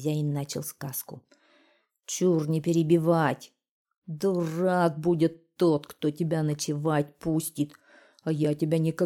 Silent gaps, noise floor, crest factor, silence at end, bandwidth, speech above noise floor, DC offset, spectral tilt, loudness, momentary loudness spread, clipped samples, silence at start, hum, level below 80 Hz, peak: 3.71-3.85 s, 3.98-4.02 s; -66 dBFS; 16 dB; 0 s; 17 kHz; 40 dB; under 0.1%; -6.5 dB/octave; -27 LUFS; 11 LU; under 0.1%; 0 s; none; -66 dBFS; -10 dBFS